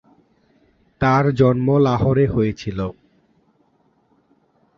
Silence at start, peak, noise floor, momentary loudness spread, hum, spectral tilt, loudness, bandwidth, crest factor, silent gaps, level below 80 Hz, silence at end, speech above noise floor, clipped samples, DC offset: 1 s; -2 dBFS; -61 dBFS; 11 LU; none; -8.5 dB/octave; -18 LUFS; 6.8 kHz; 18 dB; none; -44 dBFS; 1.85 s; 45 dB; under 0.1%; under 0.1%